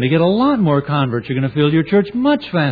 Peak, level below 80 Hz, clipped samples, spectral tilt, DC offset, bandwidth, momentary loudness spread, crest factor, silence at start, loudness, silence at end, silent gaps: -2 dBFS; -50 dBFS; under 0.1%; -10 dB/octave; under 0.1%; 4.9 kHz; 5 LU; 12 dB; 0 s; -16 LUFS; 0 s; none